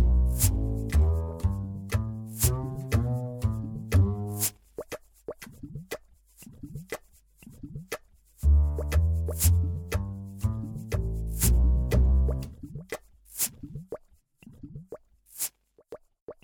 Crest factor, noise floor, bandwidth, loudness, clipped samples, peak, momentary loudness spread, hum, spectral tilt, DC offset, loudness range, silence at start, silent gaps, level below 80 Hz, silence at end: 20 dB; -59 dBFS; over 20 kHz; -28 LUFS; under 0.1%; -8 dBFS; 20 LU; none; -5.5 dB/octave; under 0.1%; 9 LU; 0 s; 16.21-16.27 s; -30 dBFS; 0.1 s